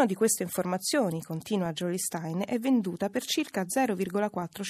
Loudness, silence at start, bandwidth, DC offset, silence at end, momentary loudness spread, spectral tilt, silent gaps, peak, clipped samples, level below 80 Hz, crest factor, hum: -29 LUFS; 0 s; 15.5 kHz; under 0.1%; 0 s; 5 LU; -4.5 dB/octave; none; -14 dBFS; under 0.1%; -72 dBFS; 16 dB; none